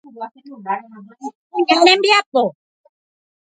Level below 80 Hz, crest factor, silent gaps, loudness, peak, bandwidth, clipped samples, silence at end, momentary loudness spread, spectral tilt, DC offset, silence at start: -70 dBFS; 18 dB; 1.35-1.50 s, 2.26-2.32 s; -15 LUFS; 0 dBFS; 9.4 kHz; under 0.1%; 0.9 s; 22 LU; -2.5 dB/octave; under 0.1%; 0.15 s